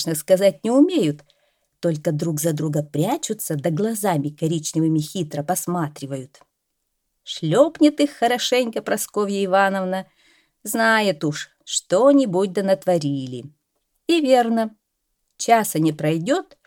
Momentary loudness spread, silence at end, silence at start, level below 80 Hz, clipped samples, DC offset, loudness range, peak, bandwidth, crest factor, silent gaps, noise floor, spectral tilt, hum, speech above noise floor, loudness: 11 LU; 0.25 s; 0 s; -70 dBFS; under 0.1%; under 0.1%; 4 LU; -2 dBFS; 18.5 kHz; 18 dB; none; -75 dBFS; -5 dB/octave; none; 55 dB; -20 LUFS